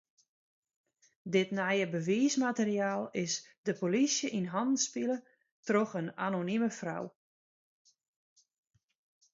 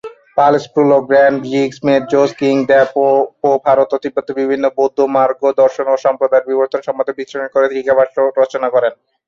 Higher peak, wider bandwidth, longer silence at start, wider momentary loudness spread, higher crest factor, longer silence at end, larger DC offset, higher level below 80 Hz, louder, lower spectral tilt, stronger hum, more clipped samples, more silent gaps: second, -16 dBFS vs -2 dBFS; about the same, 7.8 kHz vs 7.4 kHz; first, 1.25 s vs 0.05 s; first, 10 LU vs 7 LU; first, 18 dB vs 12 dB; first, 2.25 s vs 0.35 s; neither; second, -82 dBFS vs -60 dBFS; second, -32 LUFS vs -14 LUFS; second, -4 dB/octave vs -6 dB/octave; neither; neither; first, 3.58-3.64 s, 5.52-5.63 s vs none